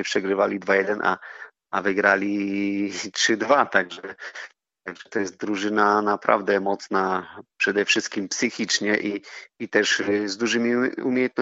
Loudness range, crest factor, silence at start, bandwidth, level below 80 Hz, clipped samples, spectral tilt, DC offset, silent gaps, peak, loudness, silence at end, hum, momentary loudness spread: 2 LU; 22 dB; 0 s; 8 kHz; -74 dBFS; under 0.1%; -2 dB/octave; under 0.1%; none; -2 dBFS; -23 LUFS; 0 s; none; 16 LU